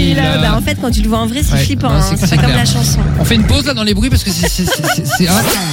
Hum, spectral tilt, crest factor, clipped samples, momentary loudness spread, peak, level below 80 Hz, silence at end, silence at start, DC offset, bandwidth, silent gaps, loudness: none; -4.5 dB/octave; 12 dB; under 0.1%; 3 LU; 0 dBFS; -20 dBFS; 0 s; 0 s; under 0.1%; 17 kHz; none; -12 LUFS